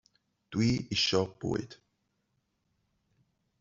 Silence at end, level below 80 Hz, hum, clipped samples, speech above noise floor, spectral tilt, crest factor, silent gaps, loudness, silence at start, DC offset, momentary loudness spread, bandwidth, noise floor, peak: 1.85 s; -60 dBFS; none; under 0.1%; 48 dB; -5 dB/octave; 22 dB; none; -30 LUFS; 0.5 s; under 0.1%; 10 LU; 7.8 kHz; -78 dBFS; -14 dBFS